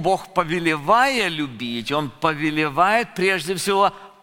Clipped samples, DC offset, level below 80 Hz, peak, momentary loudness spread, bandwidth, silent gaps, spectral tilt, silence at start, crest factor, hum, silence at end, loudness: under 0.1%; under 0.1%; -52 dBFS; -2 dBFS; 7 LU; 17 kHz; none; -4 dB/octave; 0 s; 18 dB; none; 0.15 s; -20 LUFS